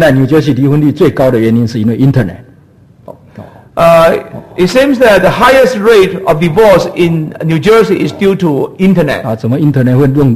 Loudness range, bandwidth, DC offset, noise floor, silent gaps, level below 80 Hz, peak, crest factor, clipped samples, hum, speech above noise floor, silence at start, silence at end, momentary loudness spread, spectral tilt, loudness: 4 LU; 15 kHz; under 0.1%; -41 dBFS; none; -36 dBFS; 0 dBFS; 8 dB; 0.8%; none; 33 dB; 0 s; 0 s; 8 LU; -7 dB/octave; -8 LUFS